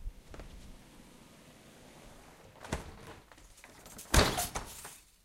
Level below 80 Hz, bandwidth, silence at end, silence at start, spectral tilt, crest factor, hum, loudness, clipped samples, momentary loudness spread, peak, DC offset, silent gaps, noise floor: -42 dBFS; 16 kHz; 0.3 s; 0 s; -3.5 dB/octave; 28 dB; none; -33 LUFS; under 0.1%; 27 LU; -10 dBFS; under 0.1%; none; -57 dBFS